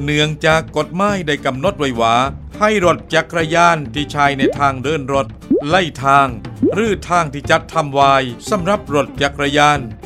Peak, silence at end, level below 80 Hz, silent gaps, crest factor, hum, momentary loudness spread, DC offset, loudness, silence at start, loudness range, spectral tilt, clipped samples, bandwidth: 0 dBFS; 0 s; -38 dBFS; none; 16 dB; none; 7 LU; under 0.1%; -15 LUFS; 0 s; 1 LU; -5 dB/octave; under 0.1%; 14.5 kHz